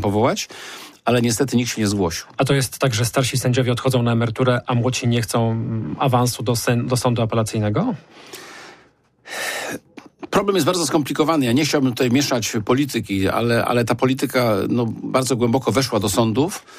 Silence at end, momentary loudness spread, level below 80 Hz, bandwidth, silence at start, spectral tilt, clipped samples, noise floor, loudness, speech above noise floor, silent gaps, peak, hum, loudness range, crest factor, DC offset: 0 s; 8 LU; -52 dBFS; 15.5 kHz; 0 s; -5 dB/octave; under 0.1%; -54 dBFS; -20 LUFS; 35 dB; none; -6 dBFS; none; 5 LU; 14 dB; under 0.1%